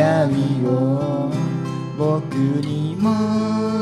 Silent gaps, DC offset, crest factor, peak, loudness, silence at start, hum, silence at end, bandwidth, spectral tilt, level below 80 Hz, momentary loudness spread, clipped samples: none; under 0.1%; 14 dB; -4 dBFS; -20 LUFS; 0 s; none; 0 s; 11.5 kHz; -8 dB/octave; -58 dBFS; 5 LU; under 0.1%